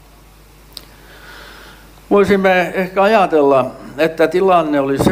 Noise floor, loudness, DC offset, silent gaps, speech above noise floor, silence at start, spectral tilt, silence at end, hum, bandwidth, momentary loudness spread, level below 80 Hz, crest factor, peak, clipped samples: -43 dBFS; -14 LUFS; under 0.1%; none; 30 dB; 1.25 s; -6 dB/octave; 0 s; none; 16 kHz; 24 LU; -44 dBFS; 16 dB; 0 dBFS; under 0.1%